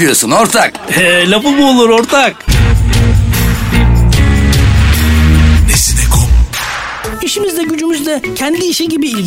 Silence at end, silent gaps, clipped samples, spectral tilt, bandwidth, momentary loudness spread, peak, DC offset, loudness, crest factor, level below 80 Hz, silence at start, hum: 0 s; none; under 0.1%; -4.5 dB/octave; 16.5 kHz; 7 LU; 0 dBFS; under 0.1%; -10 LUFS; 8 dB; -14 dBFS; 0 s; none